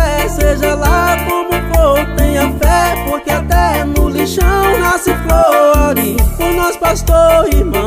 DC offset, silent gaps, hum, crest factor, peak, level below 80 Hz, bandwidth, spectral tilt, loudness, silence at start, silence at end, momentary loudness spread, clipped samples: under 0.1%; none; none; 10 dB; 0 dBFS; -16 dBFS; 16 kHz; -5 dB/octave; -12 LUFS; 0 s; 0 s; 5 LU; under 0.1%